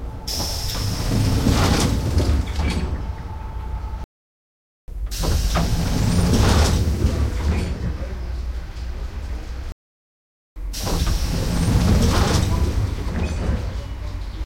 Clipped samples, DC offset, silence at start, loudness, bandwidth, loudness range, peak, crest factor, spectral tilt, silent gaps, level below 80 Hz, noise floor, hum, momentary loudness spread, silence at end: under 0.1%; under 0.1%; 0 s; -22 LUFS; 16.5 kHz; 8 LU; -4 dBFS; 18 dB; -5.5 dB/octave; 4.04-4.88 s, 9.72-10.56 s; -24 dBFS; under -90 dBFS; none; 14 LU; 0 s